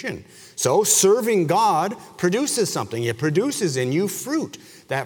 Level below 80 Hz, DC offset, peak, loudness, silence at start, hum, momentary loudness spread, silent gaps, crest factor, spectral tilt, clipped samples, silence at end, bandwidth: -64 dBFS; under 0.1%; -4 dBFS; -20 LUFS; 0 s; none; 12 LU; none; 18 dB; -4 dB/octave; under 0.1%; 0 s; over 20 kHz